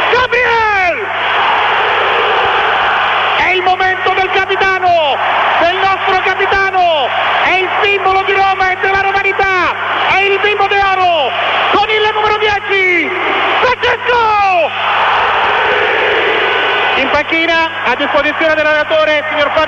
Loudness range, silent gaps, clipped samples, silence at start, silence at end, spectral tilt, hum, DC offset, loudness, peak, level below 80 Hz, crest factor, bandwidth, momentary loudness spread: 0 LU; none; under 0.1%; 0 s; 0 s; -3.5 dB/octave; none; under 0.1%; -11 LUFS; 0 dBFS; -42 dBFS; 12 dB; 8.4 kHz; 2 LU